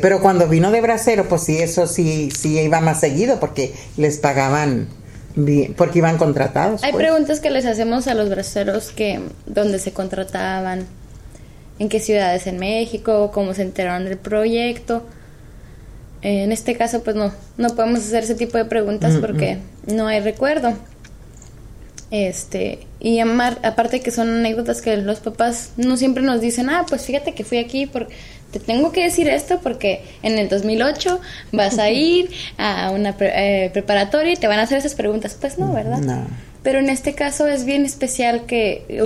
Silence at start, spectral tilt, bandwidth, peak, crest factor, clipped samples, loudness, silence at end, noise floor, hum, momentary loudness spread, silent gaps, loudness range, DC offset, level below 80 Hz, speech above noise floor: 0 s; -5 dB/octave; 15 kHz; 0 dBFS; 18 dB; under 0.1%; -19 LUFS; 0 s; -39 dBFS; none; 9 LU; none; 5 LU; under 0.1%; -42 dBFS; 21 dB